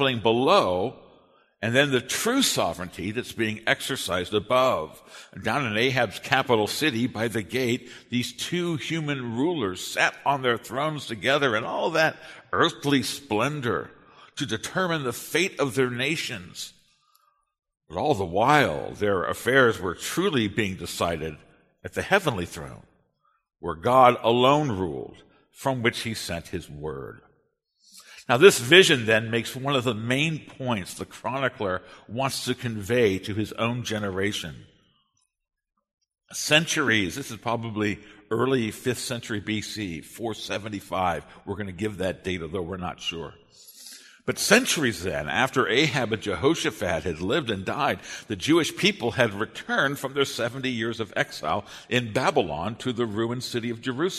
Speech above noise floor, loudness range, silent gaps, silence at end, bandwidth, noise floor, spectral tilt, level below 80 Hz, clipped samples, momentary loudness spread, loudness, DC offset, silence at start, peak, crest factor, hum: 47 dB; 7 LU; none; 0 s; 13.5 kHz; -72 dBFS; -4 dB/octave; -56 dBFS; under 0.1%; 14 LU; -25 LUFS; under 0.1%; 0 s; 0 dBFS; 24 dB; none